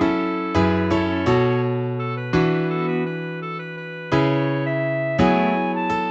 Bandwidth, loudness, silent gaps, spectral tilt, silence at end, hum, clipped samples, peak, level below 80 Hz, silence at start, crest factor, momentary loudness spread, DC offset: 8 kHz; -21 LUFS; none; -8 dB/octave; 0 s; none; under 0.1%; -4 dBFS; -46 dBFS; 0 s; 16 dB; 10 LU; under 0.1%